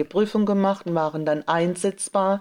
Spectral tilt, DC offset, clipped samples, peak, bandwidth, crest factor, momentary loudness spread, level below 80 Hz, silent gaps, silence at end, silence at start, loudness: -5.5 dB/octave; under 0.1%; under 0.1%; -8 dBFS; 12 kHz; 16 dB; 4 LU; -68 dBFS; none; 0 s; 0 s; -23 LUFS